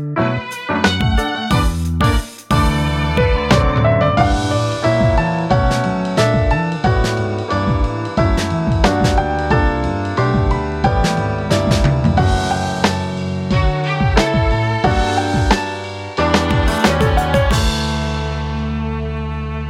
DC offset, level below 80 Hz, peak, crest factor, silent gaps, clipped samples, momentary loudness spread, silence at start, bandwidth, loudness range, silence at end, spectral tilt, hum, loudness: under 0.1%; -22 dBFS; 0 dBFS; 16 dB; none; under 0.1%; 7 LU; 0 s; 15.5 kHz; 2 LU; 0 s; -6 dB/octave; none; -17 LUFS